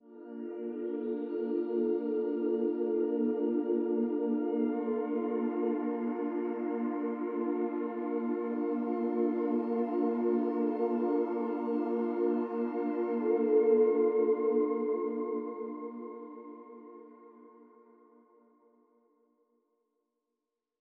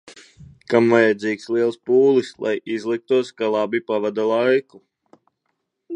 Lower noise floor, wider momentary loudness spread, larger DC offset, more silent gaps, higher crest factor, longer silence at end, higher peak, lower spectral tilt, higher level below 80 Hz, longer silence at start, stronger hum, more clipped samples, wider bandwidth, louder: first, -87 dBFS vs -75 dBFS; first, 12 LU vs 9 LU; neither; neither; about the same, 16 dB vs 18 dB; first, 3.25 s vs 0 s; second, -16 dBFS vs -2 dBFS; first, -10 dB/octave vs -6 dB/octave; second, under -90 dBFS vs -66 dBFS; about the same, 0.05 s vs 0.05 s; neither; neither; second, 4.3 kHz vs 10 kHz; second, -32 LUFS vs -20 LUFS